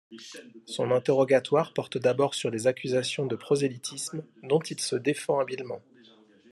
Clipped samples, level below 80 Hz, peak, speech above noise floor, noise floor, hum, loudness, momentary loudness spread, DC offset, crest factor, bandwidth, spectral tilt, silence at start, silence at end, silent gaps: under 0.1%; -74 dBFS; -10 dBFS; 29 dB; -57 dBFS; none; -27 LUFS; 16 LU; under 0.1%; 18 dB; 12.5 kHz; -4.5 dB/octave; 0.1 s; 0.75 s; none